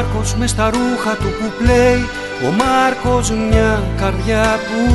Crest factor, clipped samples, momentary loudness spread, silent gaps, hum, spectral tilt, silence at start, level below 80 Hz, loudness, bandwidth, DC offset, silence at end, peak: 14 dB; under 0.1%; 6 LU; none; none; -5.5 dB/octave; 0 s; -24 dBFS; -15 LUFS; 12 kHz; under 0.1%; 0 s; 0 dBFS